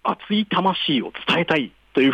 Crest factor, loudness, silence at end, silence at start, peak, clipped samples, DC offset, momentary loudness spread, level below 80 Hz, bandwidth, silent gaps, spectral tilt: 14 dB; -21 LUFS; 0 s; 0.05 s; -8 dBFS; under 0.1%; under 0.1%; 4 LU; -60 dBFS; 9.6 kHz; none; -6.5 dB/octave